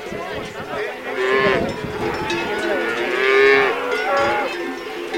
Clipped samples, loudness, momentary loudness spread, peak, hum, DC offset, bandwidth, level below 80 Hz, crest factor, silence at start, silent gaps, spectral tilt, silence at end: under 0.1%; -19 LUFS; 14 LU; 0 dBFS; none; under 0.1%; 16.5 kHz; -48 dBFS; 20 dB; 0 s; none; -4.5 dB/octave; 0 s